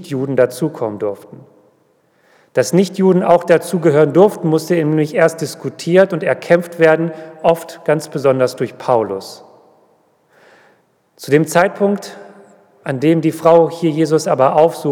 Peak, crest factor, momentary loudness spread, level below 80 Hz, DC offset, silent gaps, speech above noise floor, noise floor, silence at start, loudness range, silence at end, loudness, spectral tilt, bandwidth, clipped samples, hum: 0 dBFS; 16 dB; 12 LU; -64 dBFS; under 0.1%; none; 43 dB; -57 dBFS; 0 s; 6 LU; 0 s; -15 LUFS; -6.5 dB/octave; 17.5 kHz; under 0.1%; none